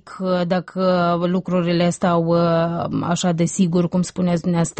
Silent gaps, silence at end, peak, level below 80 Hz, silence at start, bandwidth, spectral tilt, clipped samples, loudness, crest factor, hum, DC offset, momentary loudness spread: none; 0.1 s; -8 dBFS; -52 dBFS; 0.05 s; 8.8 kHz; -6.5 dB/octave; under 0.1%; -19 LUFS; 12 dB; none; under 0.1%; 4 LU